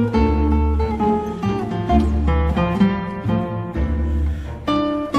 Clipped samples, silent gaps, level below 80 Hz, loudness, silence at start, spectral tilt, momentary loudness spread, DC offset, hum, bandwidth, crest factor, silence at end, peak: under 0.1%; none; -24 dBFS; -20 LUFS; 0 s; -8.5 dB/octave; 6 LU; under 0.1%; none; 6.6 kHz; 16 dB; 0 s; -4 dBFS